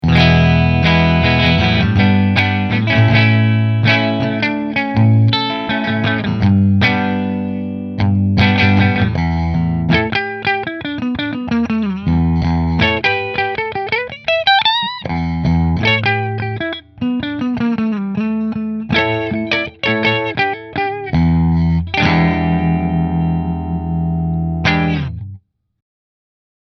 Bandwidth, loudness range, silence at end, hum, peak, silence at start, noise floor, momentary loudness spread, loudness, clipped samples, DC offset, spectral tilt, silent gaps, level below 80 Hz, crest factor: 6.4 kHz; 5 LU; 1.4 s; none; 0 dBFS; 0.05 s; -38 dBFS; 9 LU; -15 LUFS; under 0.1%; under 0.1%; -7.5 dB/octave; none; -32 dBFS; 14 dB